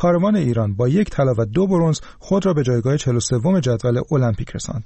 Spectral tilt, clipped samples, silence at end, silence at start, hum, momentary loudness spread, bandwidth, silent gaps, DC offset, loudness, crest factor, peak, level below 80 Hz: -7 dB/octave; under 0.1%; 0 s; 0 s; none; 4 LU; 8.8 kHz; none; 0.2%; -19 LUFS; 10 dB; -8 dBFS; -40 dBFS